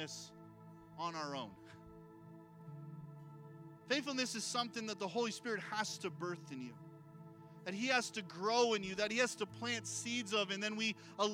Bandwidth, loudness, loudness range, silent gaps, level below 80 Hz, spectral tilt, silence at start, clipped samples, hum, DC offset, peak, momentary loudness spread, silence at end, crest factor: 16.5 kHz; -39 LUFS; 12 LU; none; -80 dBFS; -3 dB/octave; 0 s; under 0.1%; none; under 0.1%; -18 dBFS; 22 LU; 0 s; 22 dB